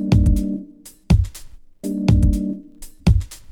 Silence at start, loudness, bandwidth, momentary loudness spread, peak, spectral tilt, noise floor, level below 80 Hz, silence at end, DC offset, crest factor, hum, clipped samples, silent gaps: 0 s; -20 LUFS; 17 kHz; 14 LU; -4 dBFS; -7.5 dB/octave; -41 dBFS; -22 dBFS; 0 s; under 0.1%; 16 dB; none; under 0.1%; none